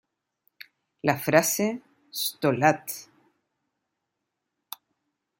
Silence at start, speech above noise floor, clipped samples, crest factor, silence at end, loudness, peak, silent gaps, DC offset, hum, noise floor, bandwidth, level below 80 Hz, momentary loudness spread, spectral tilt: 1.05 s; 58 dB; under 0.1%; 26 dB; 2.35 s; -25 LUFS; -4 dBFS; none; under 0.1%; none; -82 dBFS; 16.5 kHz; -72 dBFS; 21 LU; -4 dB/octave